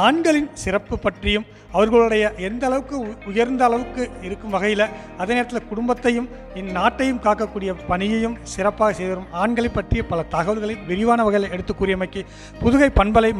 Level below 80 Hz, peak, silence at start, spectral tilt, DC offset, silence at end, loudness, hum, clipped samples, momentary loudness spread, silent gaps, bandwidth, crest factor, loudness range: -34 dBFS; 0 dBFS; 0 s; -5.5 dB/octave; under 0.1%; 0 s; -21 LUFS; none; under 0.1%; 11 LU; none; 12 kHz; 20 dB; 2 LU